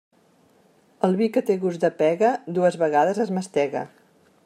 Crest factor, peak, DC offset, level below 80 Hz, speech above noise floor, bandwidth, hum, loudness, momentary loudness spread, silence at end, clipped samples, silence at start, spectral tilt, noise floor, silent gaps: 16 dB; -6 dBFS; under 0.1%; -76 dBFS; 37 dB; 13 kHz; none; -22 LUFS; 6 LU; 0.6 s; under 0.1%; 1.05 s; -6.5 dB/octave; -59 dBFS; none